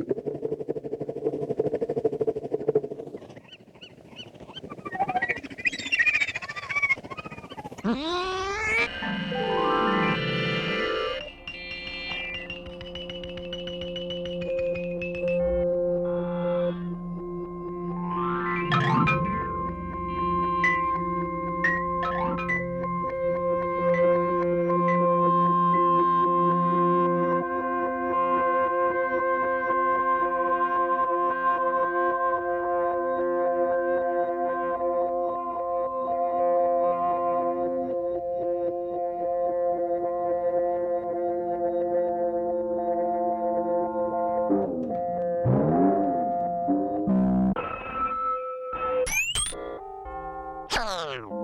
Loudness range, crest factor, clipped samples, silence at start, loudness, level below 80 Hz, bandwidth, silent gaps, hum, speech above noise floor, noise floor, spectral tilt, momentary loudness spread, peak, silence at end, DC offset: 7 LU; 16 dB; under 0.1%; 0 s; -26 LUFS; -50 dBFS; 13 kHz; none; none; 21 dB; -49 dBFS; -5.5 dB/octave; 12 LU; -10 dBFS; 0 s; under 0.1%